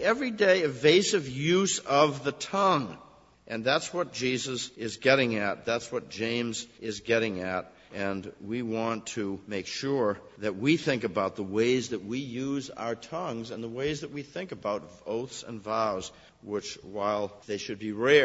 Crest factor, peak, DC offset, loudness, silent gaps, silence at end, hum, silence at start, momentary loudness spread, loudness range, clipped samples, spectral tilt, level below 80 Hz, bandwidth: 22 dB; -6 dBFS; under 0.1%; -29 LUFS; none; 0 s; none; 0 s; 13 LU; 8 LU; under 0.1%; -4 dB/octave; -64 dBFS; 8 kHz